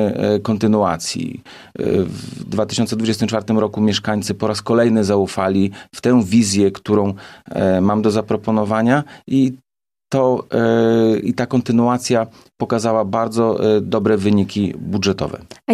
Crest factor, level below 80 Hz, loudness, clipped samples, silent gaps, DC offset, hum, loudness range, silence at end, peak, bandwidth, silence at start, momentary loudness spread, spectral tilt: 14 dB; -52 dBFS; -17 LUFS; under 0.1%; none; under 0.1%; none; 3 LU; 0 s; -4 dBFS; 13.5 kHz; 0 s; 9 LU; -6 dB/octave